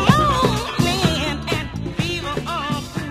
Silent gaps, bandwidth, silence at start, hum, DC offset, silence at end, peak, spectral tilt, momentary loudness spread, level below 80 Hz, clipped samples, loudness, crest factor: none; 15.5 kHz; 0 s; none; under 0.1%; 0 s; 0 dBFS; -5 dB/octave; 8 LU; -34 dBFS; under 0.1%; -21 LUFS; 20 dB